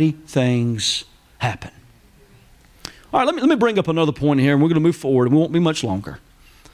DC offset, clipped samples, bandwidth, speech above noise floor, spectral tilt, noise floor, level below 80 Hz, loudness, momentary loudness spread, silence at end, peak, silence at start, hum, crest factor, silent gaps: under 0.1%; under 0.1%; 14.5 kHz; 32 dB; -6 dB/octave; -50 dBFS; -50 dBFS; -19 LUFS; 17 LU; 0.55 s; -6 dBFS; 0 s; none; 14 dB; none